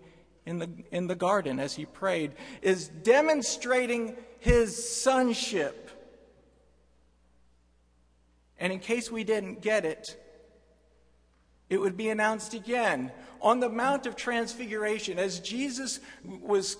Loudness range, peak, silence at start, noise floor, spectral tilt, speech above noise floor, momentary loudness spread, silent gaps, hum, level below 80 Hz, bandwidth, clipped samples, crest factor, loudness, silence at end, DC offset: 9 LU; -8 dBFS; 0.05 s; -65 dBFS; -4 dB/octave; 37 dB; 12 LU; none; none; -46 dBFS; 11 kHz; under 0.1%; 22 dB; -29 LUFS; 0 s; under 0.1%